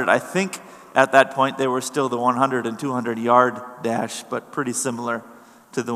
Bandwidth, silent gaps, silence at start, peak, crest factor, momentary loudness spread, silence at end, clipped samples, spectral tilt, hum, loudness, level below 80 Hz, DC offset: 15 kHz; none; 0 s; 0 dBFS; 22 dB; 13 LU; 0 s; under 0.1%; -4 dB/octave; none; -21 LUFS; -78 dBFS; under 0.1%